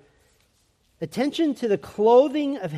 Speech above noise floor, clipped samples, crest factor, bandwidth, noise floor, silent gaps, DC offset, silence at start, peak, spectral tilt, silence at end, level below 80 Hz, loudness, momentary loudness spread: 44 dB; under 0.1%; 18 dB; 13.5 kHz; -65 dBFS; none; under 0.1%; 1 s; -6 dBFS; -6.5 dB/octave; 0 s; -64 dBFS; -22 LUFS; 12 LU